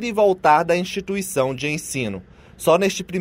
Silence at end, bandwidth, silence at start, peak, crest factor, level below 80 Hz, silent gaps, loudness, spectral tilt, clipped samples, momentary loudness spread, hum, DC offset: 0 s; 16 kHz; 0 s; -4 dBFS; 16 dB; -52 dBFS; none; -20 LUFS; -4.5 dB/octave; under 0.1%; 10 LU; none; under 0.1%